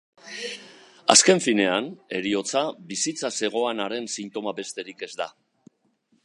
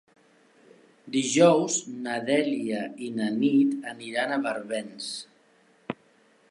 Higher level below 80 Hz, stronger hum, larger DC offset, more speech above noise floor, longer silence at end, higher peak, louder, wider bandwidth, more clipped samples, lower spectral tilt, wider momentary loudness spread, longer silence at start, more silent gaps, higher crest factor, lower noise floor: first, -70 dBFS vs -80 dBFS; neither; neither; first, 43 dB vs 36 dB; first, 0.95 s vs 0.55 s; first, 0 dBFS vs -6 dBFS; first, -23 LUFS vs -26 LUFS; about the same, 11.5 kHz vs 11.5 kHz; neither; second, -2 dB/octave vs -4 dB/octave; about the same, 18 LU vs 18 LU; second, 0.25 s vs 1.05 s; neither; first, 26 dB vs 20 dB; first, -67 dBFS vs -61 dBFS